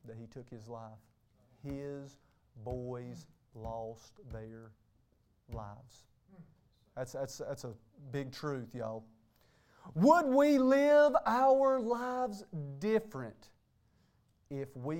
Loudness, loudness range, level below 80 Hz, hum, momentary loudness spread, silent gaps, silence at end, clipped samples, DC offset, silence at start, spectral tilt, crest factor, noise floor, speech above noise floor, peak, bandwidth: -32 LUFS; 20 LU; -62 dBFS; none; 24 LU; none; 0 s; under 0.1%; under 0.1%; 0.05 s; -6.5 dB/octave; 22 dB; -72 dBFS; 39 dB; -12 dBFS; 16.5 kHz